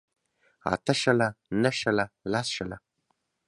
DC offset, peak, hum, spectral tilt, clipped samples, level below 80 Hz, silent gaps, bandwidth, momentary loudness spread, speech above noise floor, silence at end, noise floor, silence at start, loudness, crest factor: under 0.1%; -8 dBFS; none; -4.5 dB/octave; under 0.1%; -60 dBFS; none; 11.5 kHz; 11 LU; 49 dB; 0.7 s; -76 dBFS; 0.65 s; -27 LUFS; 22 dB